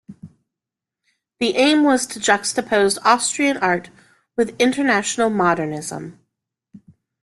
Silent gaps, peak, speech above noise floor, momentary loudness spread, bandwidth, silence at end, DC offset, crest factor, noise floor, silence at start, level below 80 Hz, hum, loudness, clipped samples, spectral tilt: none; -2 dBFS; 68 dB; 11 LU; 12.5 kHz; 0.45 s; under 0.1%; 18 dB; -86 dBFS; 0.1 s; -62 dBFS; none; -18 LUFS; under 0.1%; -3 dB/octave